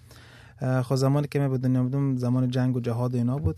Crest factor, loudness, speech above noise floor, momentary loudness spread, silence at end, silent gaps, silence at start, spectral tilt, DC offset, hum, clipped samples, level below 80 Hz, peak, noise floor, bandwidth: 14 dB; -25 LUFS; 25 dB; 3 LU; 0 s; none; 0.15 s; -8 dB/octave; under 0.1%; none; under 0.1%; -52 dBFS; -12 dBFS; -49 dBFS; 12.5 kHz